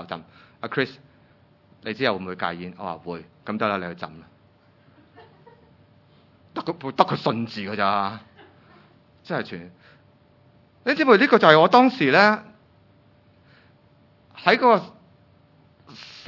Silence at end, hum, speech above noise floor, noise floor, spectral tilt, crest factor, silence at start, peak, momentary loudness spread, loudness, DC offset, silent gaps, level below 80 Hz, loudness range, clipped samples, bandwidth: 0.1 s; none; 36 dB; -57 dBFS; -6.5 dB/octave; 24 dB; 0 s; 0 dBFS; 22 LU; -21 LUFS; under 0.1%; none; -72 dBFS; 14 LU; under 0.1%; 6 kHz